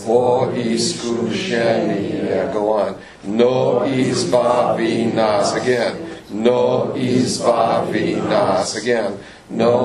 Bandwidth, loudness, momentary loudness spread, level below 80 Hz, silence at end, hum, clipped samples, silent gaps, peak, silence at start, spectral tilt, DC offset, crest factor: 12 kHz; -18 LUFS; 6 LU; -54 dBFS; 0 s; none; under 0.1%; none; 0 dBFS; 0 s; -5 dB/octave; under 0.1%; 16 dB